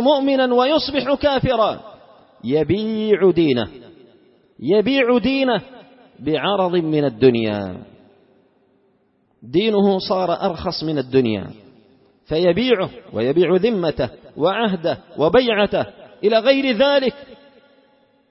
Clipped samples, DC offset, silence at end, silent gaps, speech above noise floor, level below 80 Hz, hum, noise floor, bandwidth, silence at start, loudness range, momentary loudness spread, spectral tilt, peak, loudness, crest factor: under 0.1%; under 0.1%; 0.95 s; none; 44 dB; -48 dBFS; none; -62 dBFS; 5.8 kHz; 0 s; 3 LU; 9 LU; -9.5 dB/octave; -2 dBFS; -18 LUFS; 18 dB